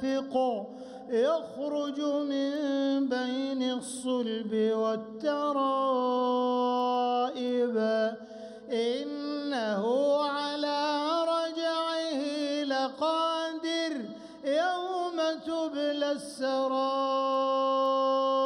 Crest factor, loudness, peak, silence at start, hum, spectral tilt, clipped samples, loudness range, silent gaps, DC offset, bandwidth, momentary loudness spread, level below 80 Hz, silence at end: 12 dB; -29 LUFS; -16 dBFS; 0 s; none; -4 dB/octave; under 0.1%; 2 LU; none; under 0.1%; 11.5 kHz; 6 LU; -78 dBFS; 0 s